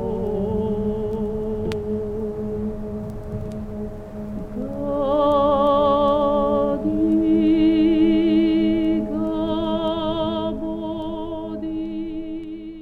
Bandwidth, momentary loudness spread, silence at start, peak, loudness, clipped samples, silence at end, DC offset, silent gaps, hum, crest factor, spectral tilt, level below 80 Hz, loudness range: 5 kHz; 14 LU; 0 s; -8 dBFS; -22 LUFS; under 0.1%; 0 s; under 0.1%; none; none; 14 dB; -8.5 dB/octave; -38 dBFS; 10 LU